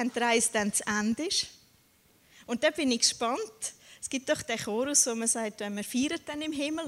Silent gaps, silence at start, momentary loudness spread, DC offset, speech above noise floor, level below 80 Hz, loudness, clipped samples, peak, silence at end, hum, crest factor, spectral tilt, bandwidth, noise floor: none; 0 s; 11 LU; under 0.1%; 34 dB; -66 dBFS; -28 LUFS; under 0.1%; -10 dBFS; 0 s; none; 20 dB; -1.5 dB/octave; 16 kHz; -64 dBFS